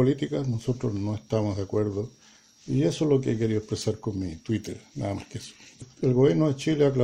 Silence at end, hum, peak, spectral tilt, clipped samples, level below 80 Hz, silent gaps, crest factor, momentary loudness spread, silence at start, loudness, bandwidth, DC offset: 0 s; none; -8 dBFS; -7 dB/octave; under 0.1%; -54 dBFS; none; 18 dB; 15 LU; 0 s; -27 LUFS; 11.5 kHz; under 0.1%